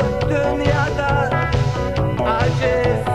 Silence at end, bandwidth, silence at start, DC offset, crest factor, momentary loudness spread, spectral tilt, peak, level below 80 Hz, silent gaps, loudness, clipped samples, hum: 0 s; 12 kHz; 0 s; 1%; 14 dB; 2 LU; -7 dB/octave; -4 dBFS; -30 dBFS; none; -19 LUFS; under 0.1%; none